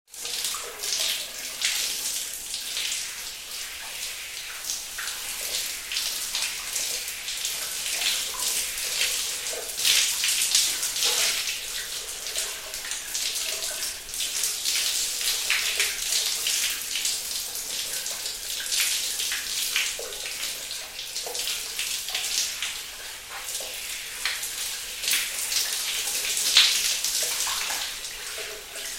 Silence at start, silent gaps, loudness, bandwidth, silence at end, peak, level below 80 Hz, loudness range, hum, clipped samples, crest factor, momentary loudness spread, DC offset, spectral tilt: 0.1 s; none; -25 LUFS; 16.5 kHz; 0 s; -2 dBFS; -56 dBFS; 6 LU; none; under 0.1%; 28 dB; 10 LU; under 0.1%; 2.5 dB/octave